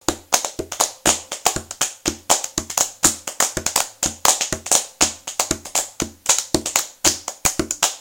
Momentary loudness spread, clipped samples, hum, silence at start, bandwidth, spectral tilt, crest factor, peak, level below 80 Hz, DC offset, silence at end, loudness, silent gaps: 6 LU; under 0.1%; none; 0.1 s; over 20 kHz; -1 dB/octave; 22 dB; 0 dBFS; -44 dBFS; under 0.1%; 0 s; -19 LUFS; none